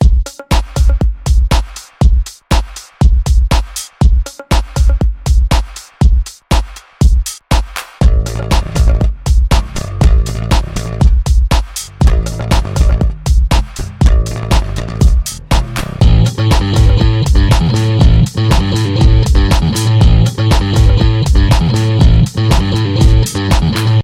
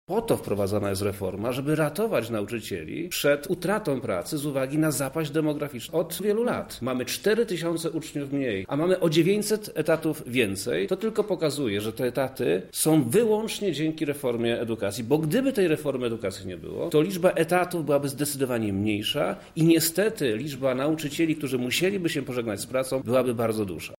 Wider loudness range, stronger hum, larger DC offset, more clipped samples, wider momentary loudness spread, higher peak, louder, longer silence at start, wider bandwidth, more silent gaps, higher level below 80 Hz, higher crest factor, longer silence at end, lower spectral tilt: about the same, 4 LU vs 2 LU; neither; neither; neither; about the same, 7 LU vs 7 LU; first, 0 dBFS vs -8 dBFS; first, -13 LUFS vs -26 LUFS; about the same, 0 s vs 0.1 s; second, 15 kHz vs 17 kHz; neither; first, -12 dBFS vs -58 dBFS; second, 10 dB vs 18 dB; about the same, 0 s vs 0.05 s; about the same, -6 dB/octave vs -5 dB/octave